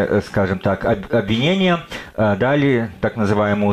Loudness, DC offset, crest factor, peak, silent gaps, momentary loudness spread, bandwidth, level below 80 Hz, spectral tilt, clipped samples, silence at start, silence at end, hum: -18 LUFS; under 0.1%; 12 dB; -6 dBFS; none; 5 LU; 13 kHz; -42 dBFS; -7 dB/octave; under 0.1%; 0 s; 0 s; none